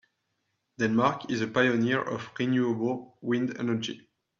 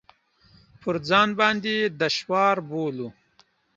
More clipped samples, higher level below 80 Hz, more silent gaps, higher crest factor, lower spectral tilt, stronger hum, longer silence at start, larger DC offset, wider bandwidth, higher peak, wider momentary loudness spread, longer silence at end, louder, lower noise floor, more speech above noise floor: neither; second, -70 dBFS vs -64 dBFS; neither; about the same, 20 dB vs 22 dB; first, -6 dB/octave vs -4.5 dB/octave; neither; about the same, 0.8 s vs 0.85 s; neither; about the same, 7.4 kHz vs 7.8 kHz; second, -8 dBFS vs -4 dBFS; second, 9 LU vs 12 LU; second, 0.4 s vs 0.65 s; second, -28 LUFS vs -23 LUFS; first, -78 dBFS vs -62 dBFS; first, 51 dB vs 39 dB